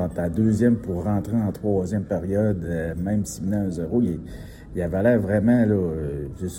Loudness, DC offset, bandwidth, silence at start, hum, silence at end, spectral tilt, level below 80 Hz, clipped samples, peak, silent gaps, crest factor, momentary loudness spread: -23 LUFS; under 0.1%; 16.5 kHz; 0 s; none; 0 s; -8 dB/octave; -44 dBFS; under 0.1%; -8 dBFS; none; 16 dB; 10 LU